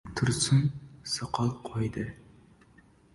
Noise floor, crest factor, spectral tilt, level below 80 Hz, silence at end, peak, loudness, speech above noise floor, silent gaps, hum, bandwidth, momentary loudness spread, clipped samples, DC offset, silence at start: -59 dBFS; 18 dB; -5 dB/octave; -54 dBFS; 1 s; -14 dBFS; -30 LUFS; 31 dB; none; none; 11.5 kHz; 13 LU; under 0.1%; under 0.1%; 0.05 s